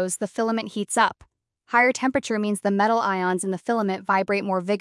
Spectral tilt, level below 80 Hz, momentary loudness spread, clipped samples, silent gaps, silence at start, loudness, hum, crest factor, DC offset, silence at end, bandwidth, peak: -4.5 dB/octave; -66 dBFS; 6 LU; under 0.1%; none; 0 s; -23 LUFS; none; 18 dB; under 0.1%; 0 s; 12 kHz; -4 dBFS